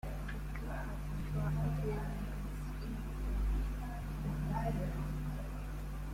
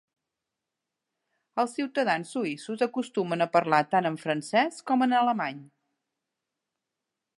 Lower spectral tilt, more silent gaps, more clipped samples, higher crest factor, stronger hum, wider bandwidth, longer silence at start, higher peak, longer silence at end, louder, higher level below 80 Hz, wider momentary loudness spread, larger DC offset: first, -7.5 dB/octave vs -5 dB/octave; neither; neither; second, 12 dB vs 22 dB; first, 50 Hz at -40 dBFS vs none; first, 16 kHz vs 11.5 kHz; second, 0.05 s vs 1.55 s; second, -26 dBFS vs -6 dBFS; second, 0 s vs 1.75 s; second, -40 LUFS vs -27 LUFS; first, -40 dBFS vs -84 dBFS; about the same, 7 LU vs 8 LU; neither